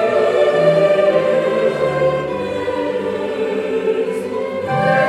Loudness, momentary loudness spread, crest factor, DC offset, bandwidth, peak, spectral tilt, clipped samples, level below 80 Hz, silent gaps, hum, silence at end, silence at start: -17 LUFS; 8 LU; 14 dB; under 0.1%; 12 kHz; -2 dBFS; -6.5 dB/octave; under 0.1%; -52 dBFS; none; none; 0 s; 0 s